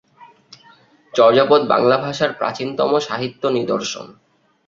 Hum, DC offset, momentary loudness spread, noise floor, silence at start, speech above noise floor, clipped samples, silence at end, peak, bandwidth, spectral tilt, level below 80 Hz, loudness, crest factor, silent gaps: none; under 0.1%; 11 LU; -51 dBFS; 0.2 s; 34 dB; under 0.1%; 0.55 s; -2 dBFS; 7.6 kHz; -4.5 dB/octave; -62 dBFS; -17 LUFS; 18 dB; none